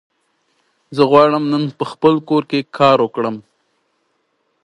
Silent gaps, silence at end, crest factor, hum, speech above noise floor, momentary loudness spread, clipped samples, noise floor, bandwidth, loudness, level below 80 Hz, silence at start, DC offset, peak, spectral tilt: none; 1.25 s; 18 dB; none; 52 dB; 12 LU; under 0.1%; -66 dBFS; 11 kHz; -15 LUFS; -64 dBFS; 0.9 s; under 0.1%; 0 dBFS; -7 dB/octave